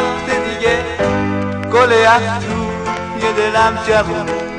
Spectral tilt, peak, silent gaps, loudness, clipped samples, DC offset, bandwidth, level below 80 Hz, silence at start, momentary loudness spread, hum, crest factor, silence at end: -5 dB/octave; 0 dBFS; none; -15 LUFS; under 0.1%; under 0.1%; 10.5 kHz; -38 dBFS; 0 s; 10 LU; none; 16 dB; 0 s